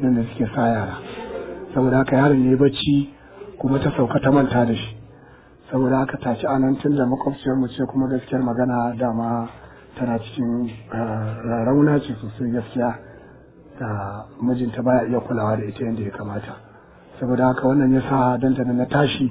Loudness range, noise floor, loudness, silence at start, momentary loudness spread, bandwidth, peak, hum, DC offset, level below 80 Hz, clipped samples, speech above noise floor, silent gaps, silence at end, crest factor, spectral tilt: 5 LU; -47 dBFS; -21 LUFS; 0 s; 13 LU; 4 kHz; -4 dBFS; none; under 0.1%; -48 dBFS; under 0.1%; 27 dB; none; 0 s; 18 dB; -11.5 dB/octave